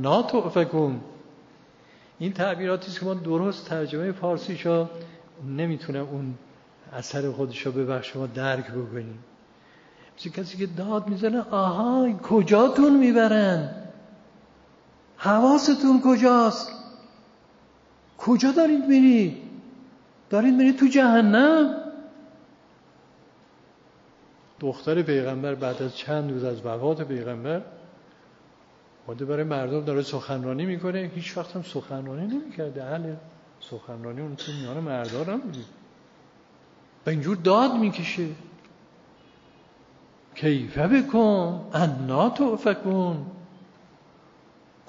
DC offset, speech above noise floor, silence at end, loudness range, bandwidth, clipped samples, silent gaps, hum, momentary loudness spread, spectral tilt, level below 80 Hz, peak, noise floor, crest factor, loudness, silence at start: under 0.1%; 33 dB; 1.25 s; 12 LU; 7.4 kHz; under 0.1%; none; none; 18 LU; -5.5 dB/octave; -64 dBFS; -6 dBFS; -56 dBFS; 18 dB; -24 LUFS; 0 s